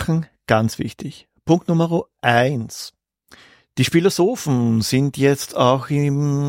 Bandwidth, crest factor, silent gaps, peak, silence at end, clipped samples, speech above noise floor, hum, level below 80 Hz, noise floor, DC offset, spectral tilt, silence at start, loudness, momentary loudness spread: 16.5 kHz; 18 dB; none; -2 dBFS; 0 s; under 0.1%; 32 dB; none; -52 dBFS; -51 dBFS; under 0.1%; -6 dB/octave; 0 s; -19 LUFS; 15 LU